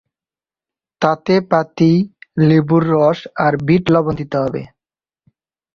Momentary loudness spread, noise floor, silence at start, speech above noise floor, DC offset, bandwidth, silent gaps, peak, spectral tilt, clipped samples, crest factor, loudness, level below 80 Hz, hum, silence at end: 7 LU; under -90 dBFS; 1 s; over 76 dB; under 0.1%; 6.8 kHz; none; 0 dBFS; -8.5 dB/octave; under 0.1%; 16 dB; -15 LUFS; -50 dBFS; none; 1.1 s